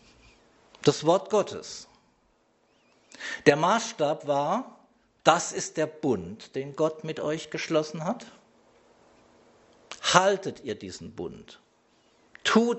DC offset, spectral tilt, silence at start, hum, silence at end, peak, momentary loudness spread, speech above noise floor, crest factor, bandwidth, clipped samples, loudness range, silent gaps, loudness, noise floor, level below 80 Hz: under 0.1%; -4 dB/octave; 0.8 s; none; 0 s; -2 dBFS; 17 LU; 41 dB; 28 dB; 8.2 kHz; under 0.1%; 6 LU; none; -27 LUFS; -67 dBFS; -68 dBFS